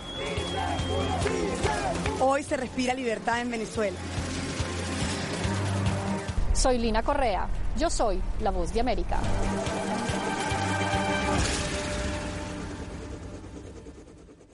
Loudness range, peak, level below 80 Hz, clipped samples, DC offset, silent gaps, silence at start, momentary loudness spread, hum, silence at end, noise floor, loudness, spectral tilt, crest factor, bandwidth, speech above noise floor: 2 LU; -14 dBFS; -36 dBFS; under 0.1%; under 0.1%; none; 0 s; 11 LU; none; 0.1 s; -50 dBFS; -29 LUFS; -4.5 dB/octave; 14 dB; 11.5 kHz; 23 dB